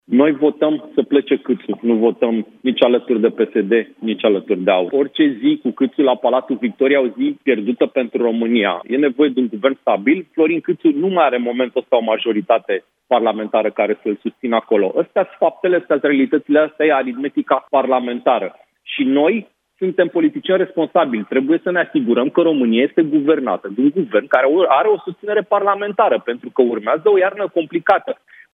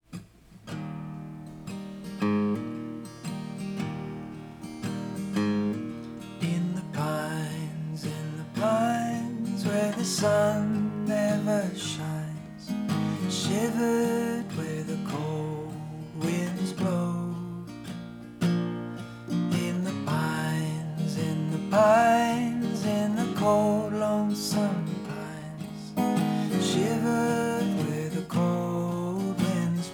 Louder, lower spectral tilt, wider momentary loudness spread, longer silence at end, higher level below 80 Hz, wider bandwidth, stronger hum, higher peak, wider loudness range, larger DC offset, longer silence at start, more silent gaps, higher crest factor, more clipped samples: first, -17 LUFS vs -28 LUFS; first, -8.5 dB/octave vs -6 dB/octave; second, 5 LU vs 14 LU; first, 0.4 s vs 0 s; second, -74 dBFS vs -62 dBFS; second, 3.9 kHz vs 19.5 kHz; neither; first, 0 dBFS vs -10 dBFS; second, 2 LU vs 8 LU; neither; about the same, 0.1 s vs 0.1 s; neither; about the same, 16 dB vs 18 dB; neither